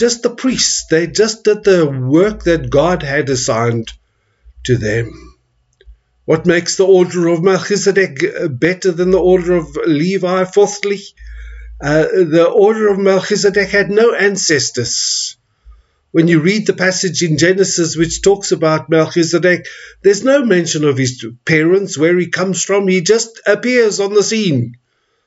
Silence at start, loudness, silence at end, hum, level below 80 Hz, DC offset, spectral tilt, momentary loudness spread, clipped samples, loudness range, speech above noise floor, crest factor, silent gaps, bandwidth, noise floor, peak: 0 s; -13 LUFS; 0.5 s; none; -40 dBFS; under 0.1%; -4.5 dB/octave; 7 LU; under 0.1%; 3 LU; 42 dB; 14 dB; none; 8 kHz; -55 dBFS; 0 dBFS